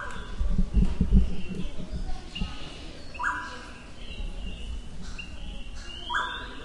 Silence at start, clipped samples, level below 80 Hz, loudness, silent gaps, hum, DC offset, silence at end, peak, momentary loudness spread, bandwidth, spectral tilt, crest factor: 0 s; under 0.1%; -32 dBFS; -33 LUFS; none; none; under 0.1%; 0 s; -6 dBFS; 15 LU; 10.5 kHz; -5.5 dB/octave; 22 dB